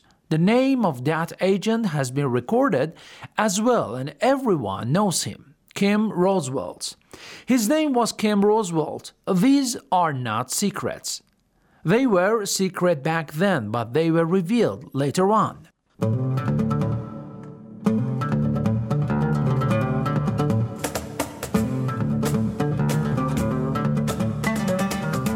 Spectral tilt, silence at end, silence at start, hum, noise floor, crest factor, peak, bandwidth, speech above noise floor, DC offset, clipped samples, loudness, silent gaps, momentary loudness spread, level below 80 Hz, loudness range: -6 dB/octave; 0 s; 0.3 s; none; -62 dBFS; 18 dB; -4 dBFS; 18 kHz; 40 dB; under 0.1%; under 0.1%; -23 LUFS; none; 10 LU; -50 dBFS; 3 LU